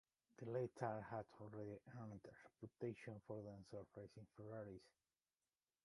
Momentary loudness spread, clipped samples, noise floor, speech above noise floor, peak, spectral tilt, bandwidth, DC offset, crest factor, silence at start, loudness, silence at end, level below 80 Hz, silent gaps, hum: 13 LU; under 0.1%; under -90 dBFS; over 36 dB; -30 dBFS; -8 dB/octave; 11 kHz; under 0.1%; 24 dB; 0.4 s; -54 LUFS; 0.95 s; -82 dBFS; none; none